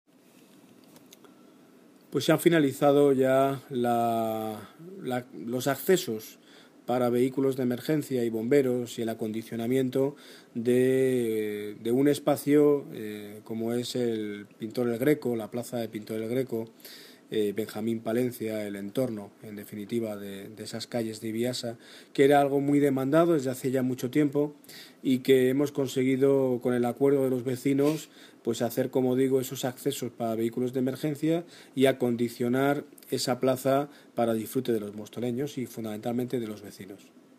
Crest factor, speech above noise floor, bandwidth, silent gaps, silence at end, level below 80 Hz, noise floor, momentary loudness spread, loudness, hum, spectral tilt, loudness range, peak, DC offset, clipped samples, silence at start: 20 dB; 30 dB; 15.5 kHz; none; 0.45 s; -74 dBFS; -57 dBFS; 15 LU; -28 LUFS; none; -6 dB/octave; 6 LU; -8 dBFS; under 0.1%; under 0.1%; 2.1 s